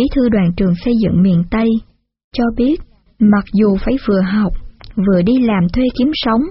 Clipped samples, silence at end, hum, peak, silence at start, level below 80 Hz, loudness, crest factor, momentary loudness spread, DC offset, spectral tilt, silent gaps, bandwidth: under 0.1%; 0 s; none; -2 dBFS; 0 s; -30 dBFS; -14 LUFS; 12 dB; 7 LU; under 0.1%; -7 dB/octave; 2.24-2.31 s; 5.8 kHz